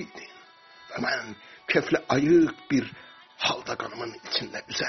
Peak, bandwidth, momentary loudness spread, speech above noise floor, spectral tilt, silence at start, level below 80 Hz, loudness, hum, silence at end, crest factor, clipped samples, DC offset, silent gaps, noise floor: -8 dBFS; 6.4 kHz; 20 LU; 25 dB; -3 dB/octave; 0 s; -62 dBFS; -26 LUFS; none; 0 s; 20 dB; under 0.1%; under 0.1%; none; -52 dBFS